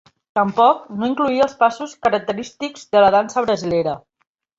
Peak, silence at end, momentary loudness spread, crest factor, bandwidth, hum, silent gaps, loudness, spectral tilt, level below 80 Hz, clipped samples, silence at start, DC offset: -2 dBFS; 0.6 s; 11 LU; 16 dB; 7.8 kHz; none; none; -18 LUFS; -5 dB/octave; -56 dBFS; under 0.1%; 0.35 s; under 0.1%